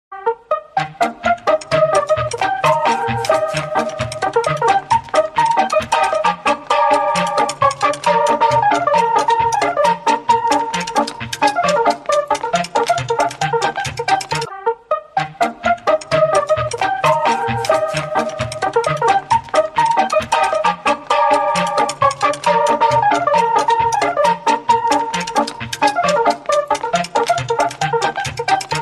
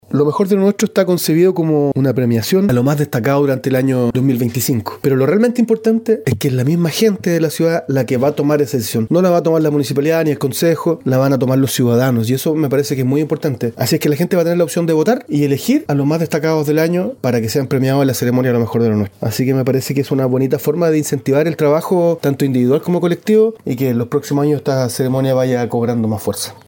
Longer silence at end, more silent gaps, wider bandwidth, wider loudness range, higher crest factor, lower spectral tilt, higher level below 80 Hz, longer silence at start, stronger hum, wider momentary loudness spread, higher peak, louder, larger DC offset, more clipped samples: second, 0 s vs 0.15 s; neither; second, 13 kHz vs 17 kHz; about the same, 3 LU vs 1 LU; about the same, 14 dB vs 12 dB; second, -3.5 dB/octave vs -6.5 dB/octave; first, -48 dBFS vs -56 dBFS; about the same, 0.1 s vs 0.1 s; neither; about the same, 6 LU vs 4 LU; about the same, -2 dBFS vs -2 dBFS; about the same, -16 LUFS vs -15 LUFS; neither; neither